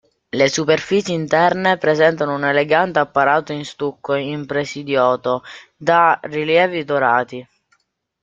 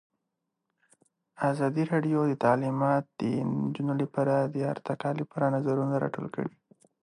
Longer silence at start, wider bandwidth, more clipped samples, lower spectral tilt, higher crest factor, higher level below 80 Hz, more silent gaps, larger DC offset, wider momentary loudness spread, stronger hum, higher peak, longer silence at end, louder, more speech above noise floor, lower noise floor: second, 0.35 s vs 1.4 s; second, 7.8 kHz vs 11 kHz; neither; second, -4.5 dB/octave vs -8.5 dB/octave; about the same, 16 dB vs 20 dB; first, -60 dBFS vs -72 dBFS; neither; neither; first, 10 LU vs 7 LU; neither; first, -2 dBFS vs -10 dBFS; first, 0.8 s vs 0.55 s; first, -17 LUFS vs -29 LUFS; second, 49 dB vs 56 dB; second, -66 dBFS vs -83 dBFS